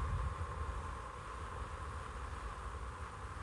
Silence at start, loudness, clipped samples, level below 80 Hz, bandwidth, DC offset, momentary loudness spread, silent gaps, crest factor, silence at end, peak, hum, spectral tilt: 0 s; -45 LUFS; under 0.1%; -46 dBFS; 11.5 kHz; under 0.1%; 5 LU; none; 14 dB; 0 s; -28 dBFS; none; -5.5 dB/octave